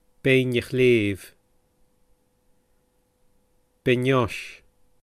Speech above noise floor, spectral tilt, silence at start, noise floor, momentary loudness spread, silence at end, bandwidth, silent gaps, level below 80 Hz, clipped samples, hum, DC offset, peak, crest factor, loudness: 45 dB; -6.5 dB/octave; 0.25 s; -66 dBFS; 15 LU; 0.5 s; 14.5 kHz; none; -56 dBFS; under 0.1%; none; under 0.1%; -6 dBFS; 20 dB; -22 LUFS